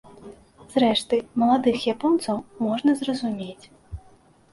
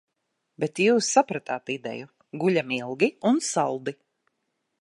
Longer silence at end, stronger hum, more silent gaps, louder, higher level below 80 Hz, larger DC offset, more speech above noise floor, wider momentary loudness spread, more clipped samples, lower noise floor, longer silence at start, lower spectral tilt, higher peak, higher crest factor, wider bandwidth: second, 0.55 s vs 0.9 s; neither; neither; about the same, -23 LUFS vs -25 LUFS; first, -52 dBFS vs -78 dBFS; neither; second, 32 dB vs 54 dB; first, 20 LU vs 13 LU; neither; second, -55 dBFS vs -79 dBFS; second, 0.2 s vs 0.6 s; about the same, -5 dB/octave vs -4 dB/octave; about the same, -8 dBFS vs -6 dBFS; about the same, 18 dB vs 20 dB; about the same, 11.5 kHz vs 11.5 kHz